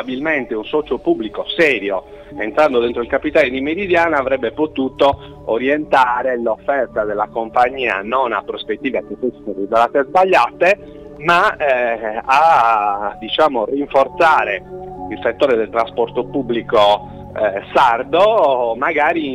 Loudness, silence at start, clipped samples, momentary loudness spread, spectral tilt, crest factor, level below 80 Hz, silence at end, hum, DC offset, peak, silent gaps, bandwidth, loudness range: -16 LUFS; 0 s; under 0.1%; 9 LU; -5.5 dB/octave; 14 dB; -46 dBFS; 0 s; none; under 0.1%; -2 dBFS; none; 12.5 kHz; 3 LU